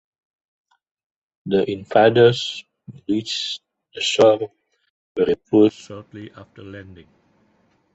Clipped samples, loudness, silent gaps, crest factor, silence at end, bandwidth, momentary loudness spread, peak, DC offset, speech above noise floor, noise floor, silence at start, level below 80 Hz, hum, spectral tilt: under 0.1%; -18 LUFS; 4.90-5.15 s; 20 dB; 1 s; 8.2 kHz; 23 LU; -2 dBFS; under 0.1%; 43 dB; -62 dBFS; 1.45 s; -58 dBFS; none; -5 dB/octave